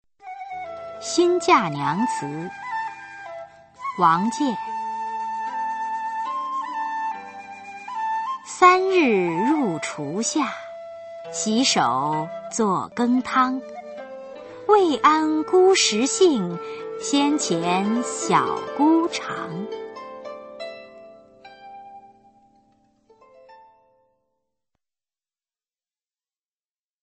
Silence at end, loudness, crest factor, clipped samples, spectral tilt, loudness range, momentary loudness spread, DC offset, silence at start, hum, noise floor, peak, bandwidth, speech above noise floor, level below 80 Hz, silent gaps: 3.45 s; -22 LUFS; 22 dB; under 0.1%; -3.5 dB/octave; 9 LU; 20 LU; under 0.1%; 0.25 s; none; under -90 dBFS; -2 dBFS; 8.8 kHz; over 70 dB; -68 dBFS; none